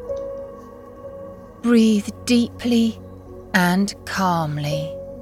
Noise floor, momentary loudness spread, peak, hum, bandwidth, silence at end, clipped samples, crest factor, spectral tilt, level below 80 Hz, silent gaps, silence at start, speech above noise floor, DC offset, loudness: -39 dBFS; 22 LU; -4 dBFS; none; 15 kHz; 0 s; under 0.1%; 16 dB; -5.5 dB/octave; -50 dBFS; none; 0 s; 20 dB; under 0.1%; -20 LUFS